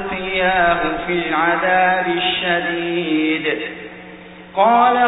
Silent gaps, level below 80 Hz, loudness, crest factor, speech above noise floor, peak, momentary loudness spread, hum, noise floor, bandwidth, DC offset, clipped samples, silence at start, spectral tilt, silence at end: none; -46 dBFS; -17 LUFS; 16 dB; 21 dB; -2 dBFS; 16 LU; none; -38 dBFS; 4 kHz; under 0.1%; under 0.1%; 0 s; -1.5 dB/octave; 0 s